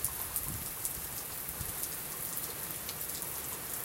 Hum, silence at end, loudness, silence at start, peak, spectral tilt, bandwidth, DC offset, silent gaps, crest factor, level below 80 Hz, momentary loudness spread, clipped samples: none; 0 s; -36 LUFS; 0 s; -10 dBFS; -1.5 dB/octave; 17 kHz; under 0.1%; none; 30 dB; -56 dBFS; 3 LU; under 0.1%